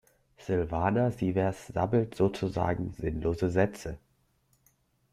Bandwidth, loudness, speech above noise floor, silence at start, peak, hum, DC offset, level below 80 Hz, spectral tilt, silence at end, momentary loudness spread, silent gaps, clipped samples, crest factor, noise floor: 14 kHz; -30 LUFS; 41 dB; 0.4 s; -10 dBFS; none; under 0.1%; -50 dBFS; -8 dB/octave; 1.15 s; 8 LU; none; under 0.1%; 20 dB; -70 dBFS